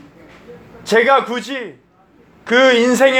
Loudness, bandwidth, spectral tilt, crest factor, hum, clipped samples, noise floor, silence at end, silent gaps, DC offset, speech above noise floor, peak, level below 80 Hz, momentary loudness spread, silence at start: -14 LUFS; 16.5 kHz; -3 dB/octave; 16 dB; none; under 0.1%; -50 dBFS; 0 s; none; under 0.1%; 37 dB; 0 dBFS; -60 dBFS; 22 LU; 0.5 s